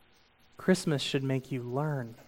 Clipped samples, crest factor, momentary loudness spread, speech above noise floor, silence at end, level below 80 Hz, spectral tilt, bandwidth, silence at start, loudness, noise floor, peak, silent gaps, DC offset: under 0.1%; 20 dB; 7 LU; 32 dB; 0.05 s; -64 dBFS; -5.5 dB/octave; 16.5 kHz; 0.6 s; -31 LUFS; -63 dBFS; -12 dBFS; none; under 0.1%